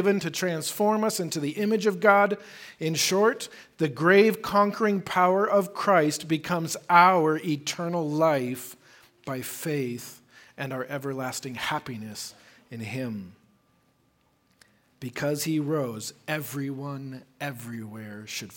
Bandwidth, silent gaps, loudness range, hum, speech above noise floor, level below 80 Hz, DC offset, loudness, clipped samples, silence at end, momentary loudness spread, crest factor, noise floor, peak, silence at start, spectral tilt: 17 kHz; none; 12 LU; none; 41 dB; -70 dBFS; under 0.1%; -25 LUFS; under 0.1%; 0 s; 18 LU; 24 dB; -67 dBFS; -2 dBFS; 0 s; -4.5 dB/octave